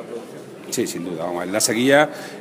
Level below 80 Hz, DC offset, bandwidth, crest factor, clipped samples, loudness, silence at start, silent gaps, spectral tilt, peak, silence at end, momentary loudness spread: -68 dBFS; under 0.1%; 15.5 kHz; 20 dB; under 0.1%; -20 LUFS; 0 s; none; -3 dB/octave; -2 dBFS; 0 s; 19 LU